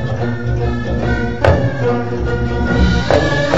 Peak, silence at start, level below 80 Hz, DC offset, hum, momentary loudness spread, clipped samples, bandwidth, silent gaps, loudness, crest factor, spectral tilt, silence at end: 0 dBFS; 0 s; -22 dBFS; 4%; none; 5 LU; 0.1%; 7.8 kHz; none; -16 LUFS; 16 dB; -7 dB/octave; 0 s